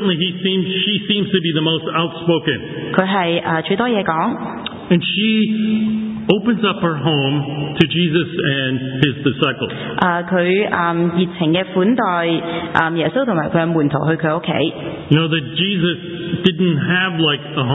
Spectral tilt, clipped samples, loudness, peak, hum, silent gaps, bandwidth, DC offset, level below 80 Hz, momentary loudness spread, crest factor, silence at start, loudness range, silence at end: -8.5 dB/octave; under 0.1%; -17 LUFS; 0 dBFS; none; none; 4 kHz; under 0.1%; -50 dBFS; 5 LU; 18 dB; 0 s; 1 LU; 0 s